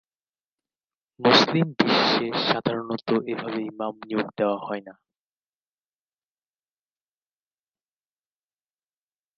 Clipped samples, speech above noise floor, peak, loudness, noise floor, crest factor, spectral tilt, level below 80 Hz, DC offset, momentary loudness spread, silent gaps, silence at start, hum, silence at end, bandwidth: under 0.1%; over 66 dB; -2 dBFS; -23 LUFS; under -90 dBFS; 26 dB; -5 dB/octave; -70 dBFS; under 0.1%; 13 LU; none; 1.2 s; none; 4.45 s; 7.2 kHz